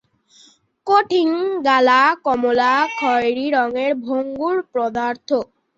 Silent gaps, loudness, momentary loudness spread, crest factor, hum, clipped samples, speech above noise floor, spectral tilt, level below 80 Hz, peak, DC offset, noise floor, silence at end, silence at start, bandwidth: none; -18 LUFS; 9 LU; 16 dB; none; under 0.1%; 35 dB; -4 dB/octave; -62 dBFS; -2 dBFS; under 0.1%; -52 dBFS; 0.35 s; 0.85 s; 7.8 kHz